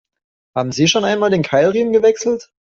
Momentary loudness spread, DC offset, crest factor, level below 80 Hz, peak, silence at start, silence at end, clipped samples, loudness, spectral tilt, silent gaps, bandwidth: 8 LU; under 0.1%; 14 dB; -56 dBFS; -2 dBFS; 0.55 s; 0.25 s; under 0.1%; -15 LUFS; -4.5 dB/octave; none; 7.8 kHz